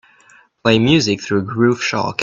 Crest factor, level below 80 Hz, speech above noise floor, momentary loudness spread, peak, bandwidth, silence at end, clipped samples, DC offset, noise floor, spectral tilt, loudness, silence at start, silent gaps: 16 dB; -50 dBFS; 34 dB; 7 LU; 0 dBFS; 7.6 kHz; 0 s; under 0.1%; under 0.1%; -50 dBFS; -5 dB/octave; -16 LUFS; 0.65 s; none